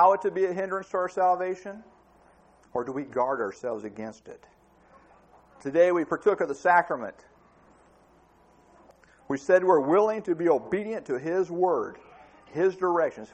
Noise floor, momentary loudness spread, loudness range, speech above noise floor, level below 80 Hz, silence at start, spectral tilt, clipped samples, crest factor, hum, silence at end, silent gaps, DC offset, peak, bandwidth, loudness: -59 dBFS; 16 LU; 9 LU; 34 dB; -68 dBFS; 0 s; -6.5 dB/octave; under 0.1%; 20 dB; none; 0.1 s; none; under 0.1%; -8 dBFS; 8.6 kHz; -26 LUFS